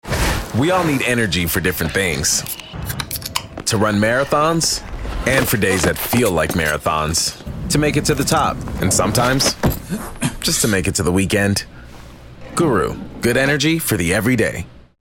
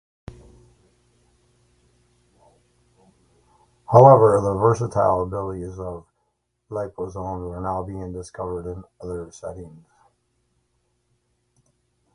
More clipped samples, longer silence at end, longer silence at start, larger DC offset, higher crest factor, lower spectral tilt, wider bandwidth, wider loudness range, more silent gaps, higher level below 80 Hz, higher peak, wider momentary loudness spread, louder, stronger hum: neither; second, 0.2 s vs 2.45 s; second, 0.05 s vs 0.3 s; neither; second, 16 dB vs 24 dB; second, -4 dB/octave vs -8.5 dB/octave; first, 17 kHz vs 11 kHz; second, 2 LU vs 18 LU; neither; first, -32 dBFS vs -48 dBFS; about the same, -2 dBFS vs 0 dBFS; second, 9 LU vs 23 LU; first, -17 LUFS vs -20 LUFS; second, none vs 60 Hz at -45 dBFS